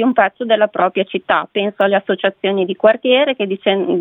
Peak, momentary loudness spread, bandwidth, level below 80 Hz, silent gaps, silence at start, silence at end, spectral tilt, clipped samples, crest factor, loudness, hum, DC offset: 0 dBFS; 4 LU; 4 kHz; -64 dBFS; none; 0 s; 0 s; -8 dB/octave; under 0.1%; 16 dB; -16 LUFS; none; under 0.1%